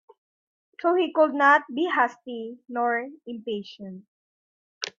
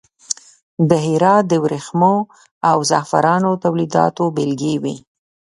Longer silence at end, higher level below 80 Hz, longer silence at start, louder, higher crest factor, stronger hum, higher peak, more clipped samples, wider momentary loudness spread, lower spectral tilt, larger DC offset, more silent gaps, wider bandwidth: second, 0.1 s vs 0.6 s; second, -80 dBFS vs -60 dBFS; first, 0.8 s vs 0.3 s; second, -23 LUFS vs -17 LUFS; about the same, 20 dB vs 16 dB; neither; second, -6 dBFS vs 0 dBFS; neither; first, 18 LU vs 12 LU; second, -4 dB/octave vs -5.5 dB/octave; neither; first, 4.08-4.81 s vs 0.62-0.77 s, 2.51-2.61 s; second, 7.4 kHz vs 11.5 kHz